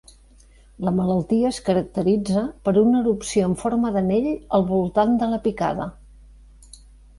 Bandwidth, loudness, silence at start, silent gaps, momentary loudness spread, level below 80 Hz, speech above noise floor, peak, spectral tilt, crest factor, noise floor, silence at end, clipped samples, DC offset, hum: 11.5 kHz; -21 LUFS; 0.8 s; none; 6 LU; -46 dBFS; 30 dB; -6 dBFS; -7 dB/octave; 16 dB; -50 dBFS; 1.25 s; under 0.1%; under 0.1%; none